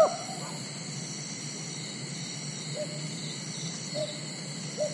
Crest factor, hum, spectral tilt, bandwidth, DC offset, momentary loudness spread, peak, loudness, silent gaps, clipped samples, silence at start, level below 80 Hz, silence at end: 24 dB; none; -3.5 dB/octave; 11.5 kHz; under 0.1%; 3 LU; -10 dBFS; -35 LUFS; none; under 0.1%; 0 s; -80 dBFS; 0 s